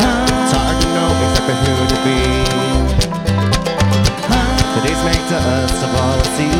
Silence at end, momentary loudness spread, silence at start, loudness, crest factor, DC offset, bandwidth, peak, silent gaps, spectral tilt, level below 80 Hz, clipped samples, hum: 0 s; 2 LU; 0 s; -15 LUFS; 14 dB; under 0.1%; 17 kHz; 0 dBFS; none; -5 dB/octave; -22 dBFS; under 0.1%; none